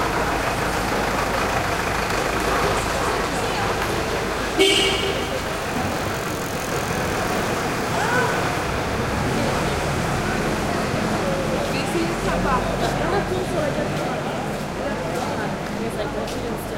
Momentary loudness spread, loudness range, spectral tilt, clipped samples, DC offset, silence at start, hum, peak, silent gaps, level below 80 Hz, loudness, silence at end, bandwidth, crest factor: 6 LU; 3 LU; -4 dB/octave; under 0.1%; under 0.1%; 0 s; none; -4 dBFS; none; -36 dBFS; -22 LUFS; 0 s; 17 kHz; 18 dB